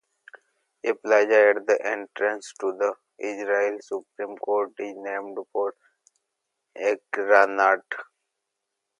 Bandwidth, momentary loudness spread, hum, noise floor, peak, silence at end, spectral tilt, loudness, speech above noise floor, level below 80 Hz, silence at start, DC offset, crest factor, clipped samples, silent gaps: 10 kHz; 15 LU; none; -82 dBFS; -4 dBFS; 0.95 s; -3 dB/octave; -24 LUFS; 58 dB; -86 dBFS; 0.85 s; under 0.1%; 22 dB; under 0.1%; none